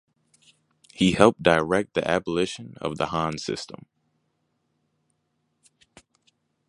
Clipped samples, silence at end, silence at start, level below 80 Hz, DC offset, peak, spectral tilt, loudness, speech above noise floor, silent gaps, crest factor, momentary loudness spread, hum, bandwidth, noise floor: under 0.1%; 2.95 s; 0.95 s; -54 dBFS; under 0.1%; 0 dBFS; -5 dB/octave; -24 LUFS; 51 dB; none; 26 dB; 15 LU; none; 11.5 kHz; -74 dBFS